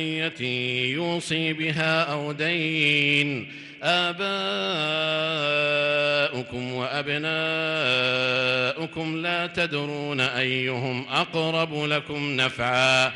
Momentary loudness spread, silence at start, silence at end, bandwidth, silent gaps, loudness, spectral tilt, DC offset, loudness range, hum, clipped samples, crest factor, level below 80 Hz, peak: 7 LU; 0 s; 0 s; 12 kHz; none; -24 LUFS; -4.5 dB/octave; under 0.1%; 2 LU; none; under 0.1%; 16 dB; -64 dBFS; -8 dBFS